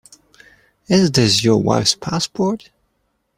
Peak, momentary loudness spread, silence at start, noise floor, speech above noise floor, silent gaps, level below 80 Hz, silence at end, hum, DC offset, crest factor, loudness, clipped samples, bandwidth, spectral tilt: 0 dBFS; 8 LU; 0.9 s; -68 dBFS; 52 dB; none; -50 dBFS; 0.8 s; none; under 0.1%; 18 dB; -16 LUFS; under 0.1%; 16 kHz; -4.5 dB/octave